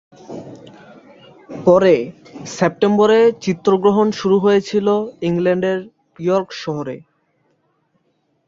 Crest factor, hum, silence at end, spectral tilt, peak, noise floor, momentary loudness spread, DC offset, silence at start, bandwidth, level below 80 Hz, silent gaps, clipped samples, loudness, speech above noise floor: 16 dB; none; 1.5 s; -6.5 dB/octave; -2 dBFS; -65 dBFS; 21 LU; under 0.1%; 0.3 s; 7.8 kHz; -58 dBFS; none; under 0.1%; -16 LUFS; 49 dB